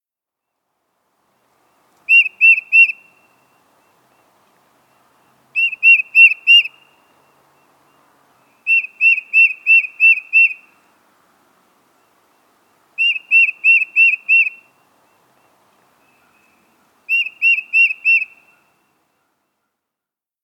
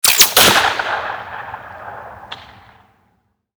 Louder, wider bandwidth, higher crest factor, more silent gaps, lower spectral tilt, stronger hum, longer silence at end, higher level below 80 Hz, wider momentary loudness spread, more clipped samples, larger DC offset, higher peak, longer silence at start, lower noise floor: about the same, -11 LUFS vs -11 LUFS; second, 14.5 kHz vs over 20 kHz; about the same, 18 dB vs 18 dB; neither; second, 2.5 dB/octave vs 0 dB/octave; neither; first, 2.3 s vs 1.15 s; second, -88 dBFS vs -48 dBFS; second, 11 LU vs 26 LU; neither; neither; about the same, 0 dBFS vs 0 dBFS; first, 2.1 s vs 0.05 s; first, -86 dBFS vs -63 dBFS